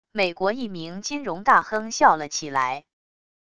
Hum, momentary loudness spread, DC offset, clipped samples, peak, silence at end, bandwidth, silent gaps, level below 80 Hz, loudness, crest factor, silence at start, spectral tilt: none; 12 LU; 0.5%; under 0.1%; -2 dBFS; 0.65 s; 11 kHz; none; -60 dBFS; -23 LUFS; 22 dB; 0.05 s; -3 dB/octave